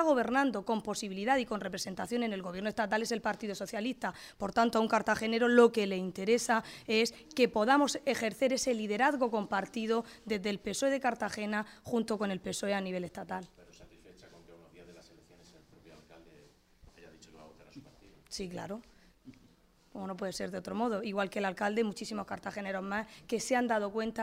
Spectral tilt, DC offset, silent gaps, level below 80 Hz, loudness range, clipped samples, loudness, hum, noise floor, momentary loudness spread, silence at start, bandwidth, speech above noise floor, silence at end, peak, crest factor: -4 dB/octave; under 0.1%; none; -66 dBFS; 18 LU; under 0.1%; -33 LUFS; none; -64 dBFS; 12 LU; 0 s; 16 kHz; 32 dB; 0 s; -10 dBFS; 24 dB